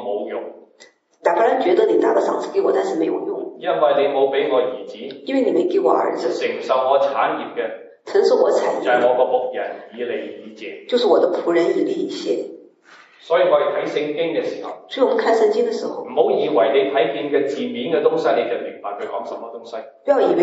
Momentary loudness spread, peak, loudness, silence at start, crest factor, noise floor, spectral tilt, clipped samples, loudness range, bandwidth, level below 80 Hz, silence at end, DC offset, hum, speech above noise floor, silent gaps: 13 LU; -2 dBFS; -19 LUFS; 0 s; 18 dB; -51 dBFS; -5 dB/octave; under 0.1%; 3 LU; 8 kHz; -84 dBFS; 0 s; under 0.1%; none; 32 dB; none